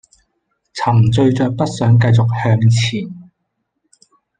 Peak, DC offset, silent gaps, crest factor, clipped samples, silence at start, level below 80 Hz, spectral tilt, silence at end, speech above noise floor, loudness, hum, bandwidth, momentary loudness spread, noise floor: -2 dBFS; under 0.1%; none; 14 dB; under 0.1%; 0.75 s; -48 dBFS; -7 dB/octave; 1.2 s; 59 dB; -14 LUFS; none; 9.2 kHz; 11 LU; -72 dBFS